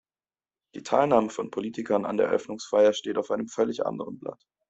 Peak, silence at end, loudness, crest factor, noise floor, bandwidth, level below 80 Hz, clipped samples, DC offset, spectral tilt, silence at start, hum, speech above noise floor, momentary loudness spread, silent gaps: -6 dBFS; 0.35 s; -26 LUFS; 20 dB; under -90 dBFS; 8.2 kHz; -68 dBFS; under 0.1%; under 0.1%; -5 dB/octave; 0.75 s; none; over 64 dB; 15 LU; none